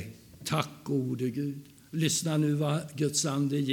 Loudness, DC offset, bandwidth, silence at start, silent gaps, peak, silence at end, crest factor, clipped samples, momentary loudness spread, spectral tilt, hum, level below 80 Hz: -30 LUFS; under 0.1%; 18 kHz; 0 s; none; -12 dBFS; 0 s; 20 dB; under 0.1%; 11 LU; -5 dB/octave; none; -68 dBFS